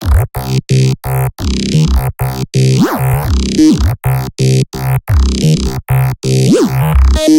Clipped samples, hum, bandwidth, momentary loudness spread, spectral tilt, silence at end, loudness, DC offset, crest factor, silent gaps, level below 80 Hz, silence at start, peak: under 0.1%; none; 17 kHz; 6 LU; -6.5 dB/octave; 0 s; -12 LUFS; under 0.1%; 10 dB; none; -18 dBFS; 0 s; 0 dBFS